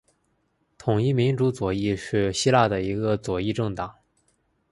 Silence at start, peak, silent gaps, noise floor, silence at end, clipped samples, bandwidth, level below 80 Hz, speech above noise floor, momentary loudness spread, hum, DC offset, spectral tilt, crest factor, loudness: 0.85 s; -4 dBFS; none; -70 dBFS; 0.8 s; under 0.1%; 11.5 kHz; -50 dBFS; 47 dB; 9 LU; none; under 0.1%; -6 dB/octave; 20 dB; -24 LUFS